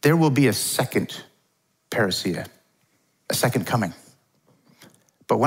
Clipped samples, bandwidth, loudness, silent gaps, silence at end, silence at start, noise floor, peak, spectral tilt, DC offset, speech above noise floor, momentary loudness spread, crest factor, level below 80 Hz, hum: under 0.1%; 16.5 kHz; -23 LUFS; none; 0 s; 0.05 s; -69 dBFS; -4 dBFS; -5 dB/octave; under 0.1%; 47 dB; 14 LU; 20 dB; -66 dBFS; none